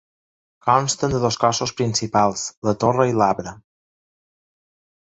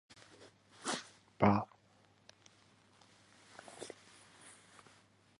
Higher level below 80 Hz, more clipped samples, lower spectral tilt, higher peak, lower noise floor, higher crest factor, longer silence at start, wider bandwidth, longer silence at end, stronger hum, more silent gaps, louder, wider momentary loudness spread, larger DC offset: first, -50 dBFS vs -68 dBFS; neither; about the same, -4.5 dB/octave vs -5.5 dB/octave; first, -2 dBFS vs -14 dBFS; first, under -90 dBFS vs -68 dBFS; second, 20 dB vs 28 dB; second, 0.65 s vs 0.8 s; second, 8.2 kHz vs 11.5 kHz; first, 1.45 s vs 0.9 s; neither; first, 2.57-2.62 s vs none; first, -20 LUFS vs -37 LUFS; second, 7 LU vs 29 LU; neither